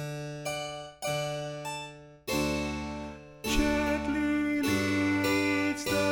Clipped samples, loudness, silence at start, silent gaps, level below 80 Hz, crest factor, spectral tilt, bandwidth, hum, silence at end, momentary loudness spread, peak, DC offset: under 0.1%; -30 LUFS; 0 s; none; -44 dBFS; 16 dB; -4.5 dB/octave; 18 kHz; none; 0 s; 12 LU; -14 dBFS; under 0.1%